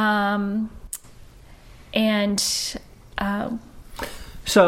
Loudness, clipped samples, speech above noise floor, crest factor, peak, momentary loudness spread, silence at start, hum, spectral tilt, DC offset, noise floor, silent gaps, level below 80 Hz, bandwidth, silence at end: -24 LUFS; under 0.1%; 22 dB; 20 dB; -4 dBFS; 15 LU; 0 s; none; -3.5 dB/octave; under 0.1%; -46 dBFS; none; -46 dBFS; 16.5 kHz; 0 s